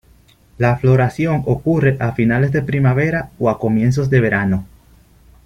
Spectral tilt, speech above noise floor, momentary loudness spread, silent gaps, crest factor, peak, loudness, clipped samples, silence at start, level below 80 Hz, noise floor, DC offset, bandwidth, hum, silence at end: -8.5 dB/octave; 35 dB; 5 LU; none; 14 dB; -2 dBFS; -16 LUFS; under 0.1%; 0.6 s; -42 dBFS; -50 dBFS; under 0.1%; 7.2 kHz; none; 0.8 s